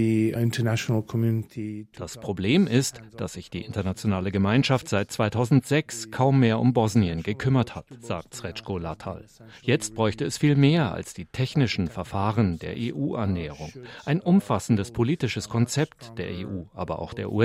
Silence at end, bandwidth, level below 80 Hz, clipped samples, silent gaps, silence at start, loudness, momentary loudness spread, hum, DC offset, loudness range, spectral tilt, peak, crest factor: 0 s; 15.5 kHz; -54 dBFS; under 0.1%; none; 0 s; -25 LUFS; 14 LU; none; under 0.1%; 4 LU; -6 dB/octave; -6 dBFS; 18 dB